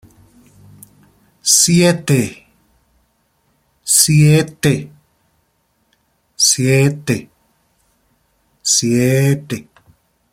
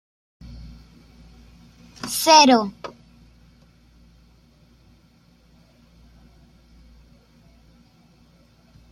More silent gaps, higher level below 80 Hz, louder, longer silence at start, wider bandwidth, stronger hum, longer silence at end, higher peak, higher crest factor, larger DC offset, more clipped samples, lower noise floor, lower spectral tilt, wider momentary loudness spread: neither; about the same, -52 dBFS vs -52 dBFS; first, -13 LUFS vs -16 LUFS; first, 1.45 s vs 0.5 s; about the same, 16.5 kHz vs 15.5 kHz; neither; second, 0.7 s vs 6.05 s; about the same, 0 dBFS vs -2 dBFS; second, 18 dB vs 24 dB; neither; neither; first, -63 dBFS vs -56 dBFS; first, -4 dB/octave vs -2.5 dB/octave; second, 13 LU vs 31 LU